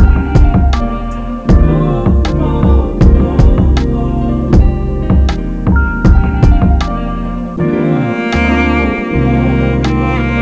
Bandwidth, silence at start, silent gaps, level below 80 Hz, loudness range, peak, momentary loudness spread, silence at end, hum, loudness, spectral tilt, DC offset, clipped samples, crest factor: 7.8 kHz; 0 s; none; -12 dBFS; 2 LU; 0 dBFS; 7 LU; 0 s; none; -12 LUFS; -8.5 dB/octave; 0.4%; 0.6%; 10 dB